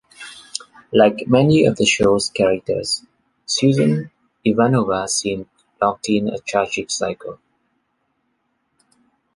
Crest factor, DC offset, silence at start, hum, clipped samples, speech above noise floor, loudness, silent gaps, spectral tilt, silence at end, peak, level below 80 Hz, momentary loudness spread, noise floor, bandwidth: 20 dB; under 0.1%; 0.2 s; none; under 0.1%; 52 dB; -18 LUFS; none; -4.5 dB/octave; 2 s; 0 dBFS; -52 dBFS; 16 LU; -69 dBFS; 11.5 kHz